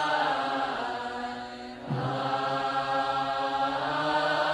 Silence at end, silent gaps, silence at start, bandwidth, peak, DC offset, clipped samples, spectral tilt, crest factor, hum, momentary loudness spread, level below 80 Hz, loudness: 0 s; none; 0 s; 12 kHz; -14 dBFS; under 0.1%; under 0.1%; -5 dB/octave; 16 dB; none; 9 LU; -62 dBFS; -29 LUFS